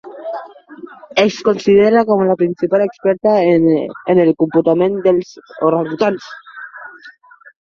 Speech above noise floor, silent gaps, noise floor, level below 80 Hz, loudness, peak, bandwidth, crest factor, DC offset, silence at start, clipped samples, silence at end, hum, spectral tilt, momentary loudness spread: 30 dB; none; -43 dBFS; -56 dBFS; -14 LUFS; -2 dBFS; 7.2 kHz; 14 dB; under 0.1%; 0.05 s; under 0.1%; 0.55 s; none; -7 dB/octave; 20 LU